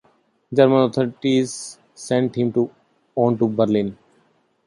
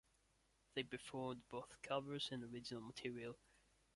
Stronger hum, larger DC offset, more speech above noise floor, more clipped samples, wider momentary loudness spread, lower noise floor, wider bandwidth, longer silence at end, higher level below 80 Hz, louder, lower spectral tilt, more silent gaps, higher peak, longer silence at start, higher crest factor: neither; neither; first, 43 dB vs 30 dB; neither; first, 14 LU vs 7 LU; second, -62 dBFS vs -79 dBFS; about the same, 11.5 kHz vs 11.5 kHz; first, 0.75 s vs 0.6 s; first, -60 dBFS vs -78 dBFS; first, -20 LUFS vs -49 LUFS; first, -6.5 dB/octave vs -4.5 dB/octave; neither; first, -2 dBFS vs -28 dBFS; second, 0.5 s vs 0.75 s; about the same, 18 dB vs 22 dB